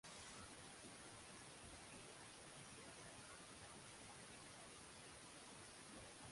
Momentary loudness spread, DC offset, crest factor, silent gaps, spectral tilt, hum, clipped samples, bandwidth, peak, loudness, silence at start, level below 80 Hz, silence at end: 1 LU; under 0.1%; 16 dB; none; -2.5 dB/octave; none; under 0.1%; 11.5 kHz; -44 dBFS; -58 LUFS; 0.05 s; -76 dBFS; 0 s